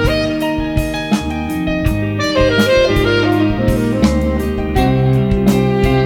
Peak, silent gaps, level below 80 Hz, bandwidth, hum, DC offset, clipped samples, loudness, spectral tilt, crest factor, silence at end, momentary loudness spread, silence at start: 0 dBFS; none; -24 dBFS; 18 kHz; none; under 0.1%; under 0.1%; -15 LUFS; -6.5 dB/octave; 14 dB; 0 s; 6 LU; 0 s